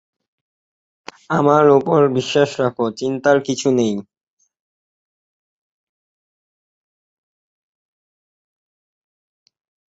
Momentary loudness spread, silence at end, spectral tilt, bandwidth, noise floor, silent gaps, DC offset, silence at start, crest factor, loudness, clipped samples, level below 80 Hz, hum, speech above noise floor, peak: 9 LU; 5.85 s; -5.5 dB/octave; 8 kHz; under -90 dBFS; none; under 0.1%; 1.3 s; 20 dB; -16 LUFS; under 0.1%; -64 dBFS; none; over 74 dB; -2 dBFS